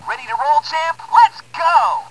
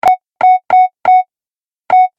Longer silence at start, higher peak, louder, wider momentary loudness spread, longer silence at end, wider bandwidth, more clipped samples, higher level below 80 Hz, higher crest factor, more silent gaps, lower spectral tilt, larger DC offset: about the same, 0 s vs 0.05 s; about the same, 0 dBFS vs -2 dBFS; second, -15 LUFS vs -11 LUFS; first, 8 LU vs 4 LU; about the same, 0 s vs 0.1 s; first, 11 kHz vs 7 kHz; neither; second, -66 dBFS vs -60 dBFS; first, 16 dB vs 10 dB; neither; second, -1 dB/octave vs -3.5 dB/octave; first, 0.4% vs under 0.1%